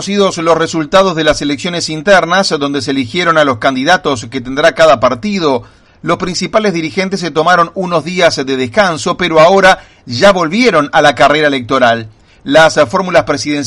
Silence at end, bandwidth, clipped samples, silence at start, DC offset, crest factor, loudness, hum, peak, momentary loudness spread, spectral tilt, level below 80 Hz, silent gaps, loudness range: 0 s; 11.5 kHz; 0.6%; 0 s; under 0.1%; 10 dB; -10 LUFS; none; 0 dBFS; 8 LU; -4 dB/octave; -40 dBFS; none; 3 LU